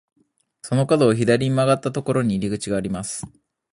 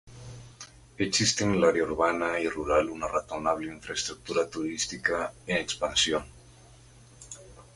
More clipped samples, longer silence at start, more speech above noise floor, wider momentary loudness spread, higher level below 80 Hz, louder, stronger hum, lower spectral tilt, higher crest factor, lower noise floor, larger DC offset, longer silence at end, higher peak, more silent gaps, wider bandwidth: neither; first, 0.65 s vs 0.05 s; about the same, 26 dB vs 25 dB; second, 13 LU vs 21 LU; about the same, -52 dBFS vs -52 dBFS; first, -21 LUFS vs -28 LUFS; neither; first, -6 dB/octave vs -3 dB/octave; about the same, 18 dB vs 20 dB; second, -46 dBFS vs -53 dBFS; neither; first, 0.45 s vs 0.1 s; first, -4 dBFS vs -10 dBFS; neither; about the same, 11.5 kHz vs 11.5 kHz